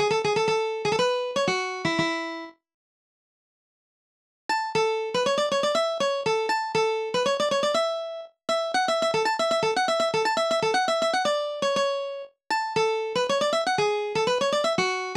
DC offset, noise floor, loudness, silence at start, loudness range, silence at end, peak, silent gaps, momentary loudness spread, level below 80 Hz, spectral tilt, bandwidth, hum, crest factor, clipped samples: under 0.1%; under -90 dBFS; -25 LUFS; 0 s; 6 LU; 0 s; -12 dBFS; 2.74-4.49 s; 5 LU; -68 dBFS; -3 dB/octave; 13.5 kHz; none; 14 dB; under 0.1%